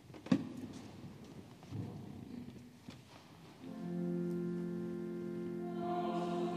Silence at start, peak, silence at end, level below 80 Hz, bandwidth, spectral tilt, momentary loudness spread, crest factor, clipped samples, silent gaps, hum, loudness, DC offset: 0 s; -16 dBFS; 0 s; -74 dBFS; 14 kHz; -7.5 dB/octave; 17 LU; 26 dB; under 0.1%; none; none; -41 LUFS; under 0.1%